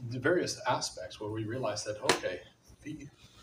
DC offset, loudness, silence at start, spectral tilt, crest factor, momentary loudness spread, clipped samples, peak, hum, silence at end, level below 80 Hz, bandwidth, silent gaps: under 0.1%; -33 LUFS; 0 s; -4 dB/octave; 26 dB; 16 LU; under 0.1%; -10 dBFS; none; 0 s; -64 dBFS; 15.5 kHz; none